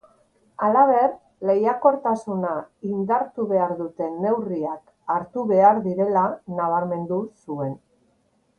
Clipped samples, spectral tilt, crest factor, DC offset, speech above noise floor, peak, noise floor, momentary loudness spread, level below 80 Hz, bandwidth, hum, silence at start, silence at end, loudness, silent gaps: under 0.1%; -9.5 dB/octave; 20 dB; under 0.1%; 44 dB; -4 dBFS; -65 dBFS; 13 LU; -68 dBFS; 9.4 kHz; none; 0.6 s; 0.8 s; -22 LUFS; none